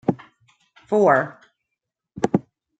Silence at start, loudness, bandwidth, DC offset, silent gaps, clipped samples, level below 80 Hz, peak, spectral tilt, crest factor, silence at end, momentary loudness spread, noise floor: 0.1 s; -21 LUFS; 9 kHz; under 0.1%; none; under 0.1%; -62 dBFS; -2 dBFS; -7.5 dB/octave; 20 dB; 0.4 s; 14 LU; -83 dBFS